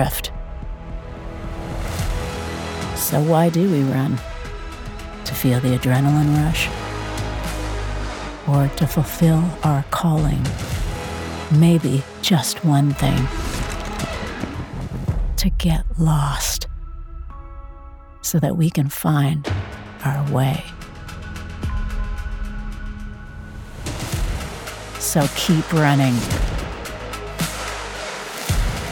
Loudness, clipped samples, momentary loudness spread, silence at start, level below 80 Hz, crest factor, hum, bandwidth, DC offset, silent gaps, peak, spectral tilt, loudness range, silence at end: -21 LUFS; under 0.1%; 17 LU; 0 s; -30 dBFS; 20 dB; none; 19 kHz; under 0.1%; none; -2 dBFS; -5.5 dB/octave; 7 LU; 0 s